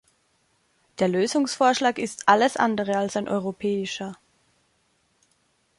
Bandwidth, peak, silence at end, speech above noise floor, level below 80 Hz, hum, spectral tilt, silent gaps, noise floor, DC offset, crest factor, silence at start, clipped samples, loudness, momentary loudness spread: 11.5 kHz; -4 dBFS; 1.65 s; 45 dB; -68 dBFS; none; -4 dB/octave; none; -68 dBFS; under 0.1%; 22 dB; 1 s; under 0.1%; -23 LUFS; 11 LU